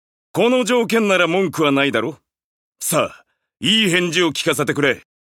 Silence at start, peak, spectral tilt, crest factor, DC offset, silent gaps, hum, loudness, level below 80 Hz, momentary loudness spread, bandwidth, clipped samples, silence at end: 0.35 s; -2 dBFS; -3.5 dB/octave; 16 dB; under 0.1%; 2.44-2.72 s; none; -17 LUFS; -62 dBFS; 10 LU; 17 kHz; under 0.1%; 0.35 s